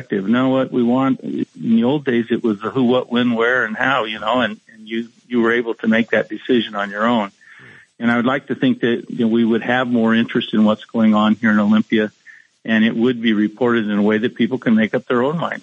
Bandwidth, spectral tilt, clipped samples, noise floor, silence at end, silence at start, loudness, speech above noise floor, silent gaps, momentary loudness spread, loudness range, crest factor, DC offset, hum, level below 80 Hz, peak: 7.2 kHz; -7 dB/octave; under 0.1%; -44 dBFS; 0.05 s; 0 s; -18 LUFS; 27 dB; none; 6 LU; 3 LU; 18 dB; under 0.1%; none; -72 dBFS; 0 dBFS